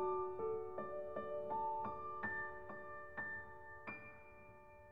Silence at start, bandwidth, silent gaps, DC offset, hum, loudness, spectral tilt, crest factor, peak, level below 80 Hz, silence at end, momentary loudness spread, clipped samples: 0 s; 5.2 kHz; none; 0.2%; none; -46 LUFS; -5.5 dB/octave; 16 dB; -30 dBFS; -70 dBFS; 0 s; 16 LU; under 0.1%